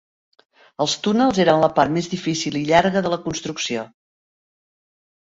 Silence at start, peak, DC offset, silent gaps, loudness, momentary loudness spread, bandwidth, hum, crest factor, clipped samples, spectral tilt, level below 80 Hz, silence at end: 0.8 s; -2 dBFS; under 0.1%; none; -20 LUFS; 9 LU; 8 kHz; none; 20 dB; under 0.1%; -4.5 dB/octave; -54 dBFS; 1.45 s